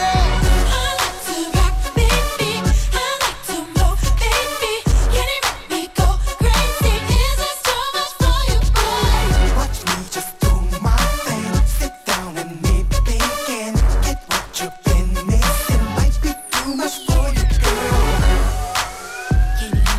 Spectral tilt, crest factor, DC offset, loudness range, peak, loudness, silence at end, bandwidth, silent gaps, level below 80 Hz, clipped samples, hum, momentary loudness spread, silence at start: -4 dB/octave; 16 dB; under 0.1%; 2 LU; -2 dBFS; -19 LUFS; 0 s; 16 kHz; none; -18 dBFS; under 0.1%; none; 5 LU; 0 s